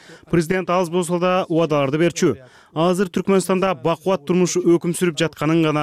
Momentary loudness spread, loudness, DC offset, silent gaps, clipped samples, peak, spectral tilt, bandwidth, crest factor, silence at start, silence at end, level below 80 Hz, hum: 4 LU; -19 LUFS; under 0.1%; none; under 0.1%; -8 dBFS; -5.5 dB/octave; 15 kHz; 12 dB; 0.1 s; 0 s; -54 dBFS; none